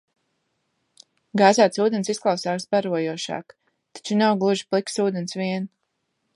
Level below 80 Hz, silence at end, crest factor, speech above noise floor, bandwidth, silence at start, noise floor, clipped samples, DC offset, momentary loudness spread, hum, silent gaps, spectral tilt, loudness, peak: -74 dBFS; 0.7 s; 22 dB; 53 dB; 11.5 kHz; 1.35 s; -75 dBFS; under 0.1%; under 0.1%; 12 LU; none; none; -5 dB/octave; -22 LUFS; -2 dBFS